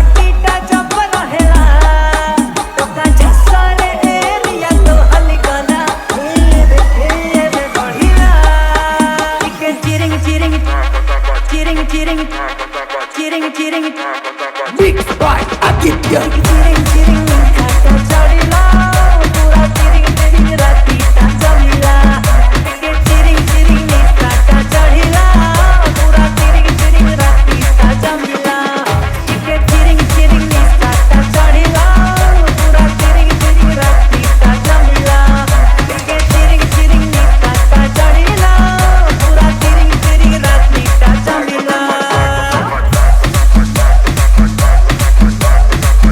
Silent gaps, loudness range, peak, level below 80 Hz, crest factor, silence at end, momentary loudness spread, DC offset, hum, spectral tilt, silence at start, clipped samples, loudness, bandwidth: none; 4 LU; 0 dBFS; -8 dBFS; 8 dB; 0 s; 6 LU; under 0.1%; none; -5 dB/octave; 0 s; 0.8%; -10 LUFS; 16 kHz